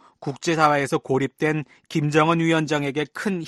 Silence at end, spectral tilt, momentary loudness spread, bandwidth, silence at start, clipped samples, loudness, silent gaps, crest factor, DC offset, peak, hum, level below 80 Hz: 0 s; -5.5 dB/octave; 9 LU; 12.5 kHz; 0.2 s; under 0.1%; -22 LUFS; none; 18 dB; under 0.1%; -4 dBFS; none; -62 dBFS